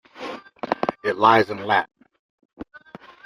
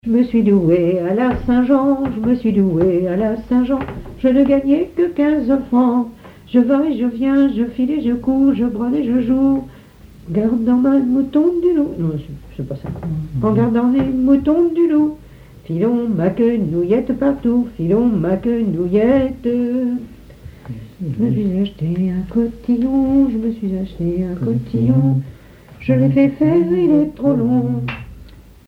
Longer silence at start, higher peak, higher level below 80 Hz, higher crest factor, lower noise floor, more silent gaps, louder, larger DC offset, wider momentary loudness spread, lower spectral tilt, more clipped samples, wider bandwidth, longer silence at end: about the same, 0.15 s vs 0.05 s; about the same, -2 dBFS vs -2 dBFS; second, -62 dBFS vs -40 dBFS; first, 22 dB vs 14 dB; first, -45 dBFS vs -41 dBFS; first, 2.19-2.38 s, 2.45-2.49 s vs none; second, -20 LUFS vs -16 LUFS; neither; first, 25 LU vs 9 LU; second, -5.5 dB/octave vs -10 dB/octave; neither; first, 15.5 kHz vs 5 kHz; first, 0.6 s vs 0.25 s